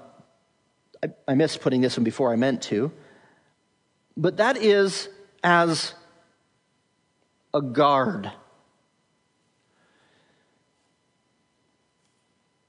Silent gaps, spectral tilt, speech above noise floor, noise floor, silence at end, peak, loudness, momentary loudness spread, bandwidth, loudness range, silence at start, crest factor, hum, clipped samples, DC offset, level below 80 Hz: none; -5 dB/octave; 48 dB; -70 dBFS; 4.35 s; -6 dBFS; -23 LUFS; 14 LU; 11 kHz; 4 LU; 1 s; 20 dB; none; under 0.1%; under 0.1%; -76 dBFS